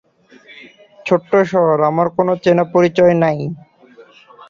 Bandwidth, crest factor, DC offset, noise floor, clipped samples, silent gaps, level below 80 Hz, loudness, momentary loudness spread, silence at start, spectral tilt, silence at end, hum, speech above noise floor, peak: 7.4 kHz; 14 dB; under 0.1%; -45 dBFS; under 0.1%; none; -58 dBFS; -14 LUFS; 12 LU; 0.6 s; -7.5 dB/octave; 0.95 s; none; 32 dB; -2 dBFS